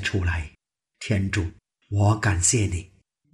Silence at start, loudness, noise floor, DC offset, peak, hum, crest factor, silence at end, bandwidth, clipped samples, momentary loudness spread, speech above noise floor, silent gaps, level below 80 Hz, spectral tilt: 0 s; -24 LUFS; -54 dBFS; under 0.1%; -8 dBFS; none; 18 dB; 0.45 s; 12.5 kHz; under 0.1%; 14 LU; 31 dB; none; -40 dBFS; -4.5 dB/octave